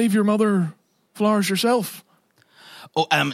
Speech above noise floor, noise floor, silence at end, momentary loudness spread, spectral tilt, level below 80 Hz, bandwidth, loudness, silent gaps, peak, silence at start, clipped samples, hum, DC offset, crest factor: 41 dB; -60 dBFS; 0 s; 10 LU; -5 dB/octave; -76 dBFS; 16 kHz; -21 LUFS; none; -4 dBFS; 0 s; under 0.1%; none; under 0.1%; 18 dB